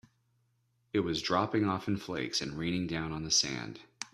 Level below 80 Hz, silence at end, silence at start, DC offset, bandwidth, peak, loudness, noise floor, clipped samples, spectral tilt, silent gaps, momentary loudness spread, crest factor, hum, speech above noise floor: -60 dBFS; 0.05 s; 0.95 s; under 0.1%; 14 kHz; -14 dBFS; -32 LUFS; -74 dBFS; under 0.1%; -3.5 dB/octave; none; 8 LU; 20 dB; none; 42 dB